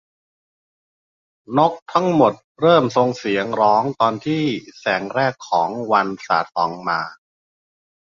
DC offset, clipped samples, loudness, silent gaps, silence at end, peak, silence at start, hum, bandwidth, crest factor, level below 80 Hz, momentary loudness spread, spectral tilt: under 0.1%; under 0.1%; -19 LUFS; 1.82-1.86 s, 2.44-2.55 s; 0.95 s; -2 dBFS; 1.5 s; none; 7.4 kHz; 18 dB; -62 dBFS; 8 LU; -6 dB/octave